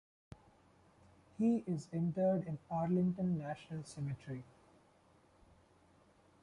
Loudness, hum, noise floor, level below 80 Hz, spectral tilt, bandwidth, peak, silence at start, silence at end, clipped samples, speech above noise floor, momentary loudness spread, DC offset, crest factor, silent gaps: -38 LUFS; none; -68 dBFS; -70 dBFS; -8.5 dB/octave; 11 kHz; -24 dBFS; 1.4 s; 2 s; under 0.1%; 32 dB; 14 LU; under 0.1%; 16 dB; none